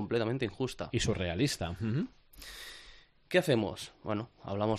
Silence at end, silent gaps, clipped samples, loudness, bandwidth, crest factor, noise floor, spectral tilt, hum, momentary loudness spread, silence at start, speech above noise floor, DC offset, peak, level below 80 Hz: 0 s; none; under 0.1%; -33 LUFS; 14 kHz; 20 dB; -57 dBFS; -5.5 dB/octave; none; 15 LU; 0 s; 24 dB; under 0.1%; -12 dBFS; -56 dBFS